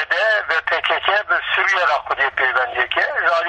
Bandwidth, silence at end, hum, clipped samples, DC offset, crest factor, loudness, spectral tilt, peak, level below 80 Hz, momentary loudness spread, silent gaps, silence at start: 9.2 kHz; 0 s; none; under 0.1%; under 0.1%; 18 dB; -17 LUFS; -1.5 dB/octave; 0 dBFS; -56 dBFS; 3 LU; none; 0 s